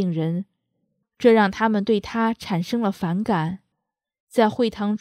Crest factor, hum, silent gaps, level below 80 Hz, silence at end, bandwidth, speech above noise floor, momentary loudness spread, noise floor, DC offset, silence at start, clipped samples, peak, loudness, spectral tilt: 20 dB; none; 4.20-4.27 s; -56 dBFS; 0.05 s; 14 kHz; 60 dB; 10 LU; -81 dBFS; under 0.1%; 0 s; under 0.1%; -2 dBFS; -22 LUFS; -7 dB/octave